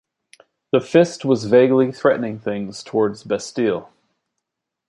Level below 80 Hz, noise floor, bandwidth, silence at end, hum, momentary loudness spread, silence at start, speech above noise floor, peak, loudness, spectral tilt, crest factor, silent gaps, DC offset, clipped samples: -62 dBFS; -80 dBFS; 11 kHz; 1.05 s; none; 11 LU; 0.75 s; 62 dB; -2 dBFS; -19 LUFS; -6 dB/octave; 18 dB; none; under 0.1%; under 0.1%